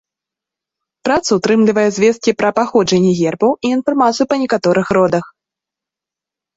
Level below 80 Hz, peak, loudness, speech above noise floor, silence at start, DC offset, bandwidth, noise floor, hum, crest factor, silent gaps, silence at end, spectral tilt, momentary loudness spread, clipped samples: -54 dBFS; -2 dBFS; -14 LUFS; 73 dB; 1.05 s; under 0.1%; 8 kHz; -86 dBFS; none; 14 dB; none; 1.3 s; -5.5 dB/octave; 4 LU; under 0.1%